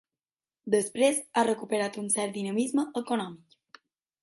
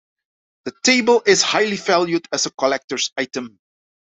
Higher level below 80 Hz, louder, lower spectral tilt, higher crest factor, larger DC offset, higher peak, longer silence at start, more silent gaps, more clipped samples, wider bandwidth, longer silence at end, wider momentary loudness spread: second, -78 dBFS vs -66 dBFS; second, -28 LUFS vs -18 LUFS; first, -3.5 dB/octave vs -2 dB/octave; about the same, 18 dB vs 18 dB; neither; second, -12 dBFS vs -2 dBFS; about the same, 0.65 s vs 0.65 s; second, none vs 2.84-2.88 s; neither; first, 12 kHz vs 8.4 kHz; first, 0.85 s vs 0.7 s; second, 7 LU vs 16 LU